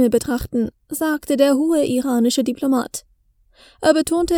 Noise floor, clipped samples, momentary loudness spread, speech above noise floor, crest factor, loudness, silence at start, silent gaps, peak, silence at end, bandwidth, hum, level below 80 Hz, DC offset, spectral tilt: -58 dBFS; under 0.1%; 8 LU; 40 dB; 18 dB; -19 LUFS; 0 s; none; 0 dBFS; 0 s; 20 kHz; none; -44 dBFS; under 0.1%; -4 dB/octave